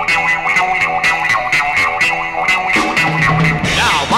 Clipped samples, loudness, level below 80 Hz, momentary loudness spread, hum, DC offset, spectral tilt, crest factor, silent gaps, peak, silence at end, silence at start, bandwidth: under 0.1%; -13 LUFS; -36 dBFS; 2 LU; none; under 0.1%; -3.5 dB/octave; 12 dB; none; -2 dBFS; 0 s; 0 s; 16 kHz